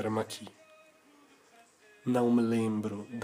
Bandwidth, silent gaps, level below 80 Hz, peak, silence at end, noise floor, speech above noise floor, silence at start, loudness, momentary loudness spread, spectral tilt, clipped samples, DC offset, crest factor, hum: 15.5 kHz; none; -76 dBFS; -16 dBFS; 0 s; -61 dBFS; 31 dB; 0 s; -31 LUFS; 15 LU; -6.5 dB/octave; under 0.1%; under 0.1%; 18 dB; none